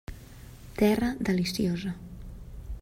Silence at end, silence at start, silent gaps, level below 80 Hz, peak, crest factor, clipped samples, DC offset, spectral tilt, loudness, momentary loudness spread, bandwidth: 0 s; 0.1 s; none; -44 dBFS; -12 dBFS; 18 dB; under 0.1%; under 0.1%; -6 dB/octave; -28 LUFS; 22 LU; 16 kHz